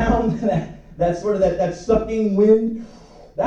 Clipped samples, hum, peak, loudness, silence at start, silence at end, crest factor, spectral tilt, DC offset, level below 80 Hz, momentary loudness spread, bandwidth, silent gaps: under 0.1%; none; -4 dBFS; -19 LUFS; 0 s; 0 s; 16 dB; -8 dB/octave; under 0.1%; -36 dBFS; 12 LU; 8.2 kHz; none